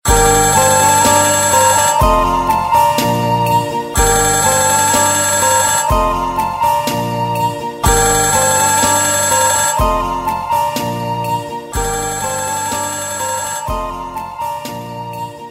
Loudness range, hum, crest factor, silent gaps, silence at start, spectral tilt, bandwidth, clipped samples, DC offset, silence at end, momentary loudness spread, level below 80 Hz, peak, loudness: 8 LU; none; 14 dB; none; 0.05 s; -2.5 dB/octave; 16.5 kHz; under 0.1%; under 0.1%; 0 s; 12 LU; -28 dBFS; 0 dBFS; -13 LUFS